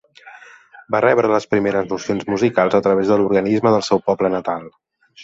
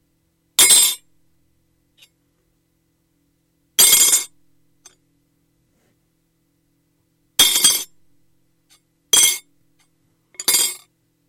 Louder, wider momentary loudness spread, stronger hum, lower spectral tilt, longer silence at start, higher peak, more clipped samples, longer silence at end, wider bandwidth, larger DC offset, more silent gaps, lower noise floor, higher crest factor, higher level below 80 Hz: second, -17 LUFS vs -13 LUFS; second, 7 LU vs 21 LU; neither; first, -6 dB/octave vs 2.5 dB/octave; second, 0.25 s vs 0.6 s; about the same, -2 dBFS vs 0 dBFS; neither; second, 0 s vs 0.5 s; second, 7.8 kHz vs 16.5 kHz; neither; neither; second, -44 dBFS vs -66 dBFS; about the same, 16 dB vs 20 dB; first, -54 dBFS vs -60 dBFS